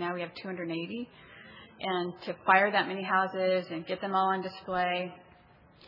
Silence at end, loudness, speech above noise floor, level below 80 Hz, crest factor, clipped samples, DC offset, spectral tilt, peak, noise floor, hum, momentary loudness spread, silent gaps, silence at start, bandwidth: 0 s; -30 LUFS; 28 dB; -70 dBFS; 22 dB; under 0.1%; under 0.1%; -7.5 dB/octave; -8 dBFS; -58 dBFS; none; 17 LU; none; 0 s; 5.8 kHz